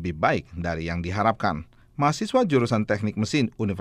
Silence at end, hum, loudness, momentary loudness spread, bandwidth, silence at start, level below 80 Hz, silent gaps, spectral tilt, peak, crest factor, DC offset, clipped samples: 0 s; none; -25 LUFS; 7 LU; 14 kHz; 0 s; -48 dBFS; none; -6 dB/octave; -6 dBFS; 18 dB; under 0.1%; under 0.1%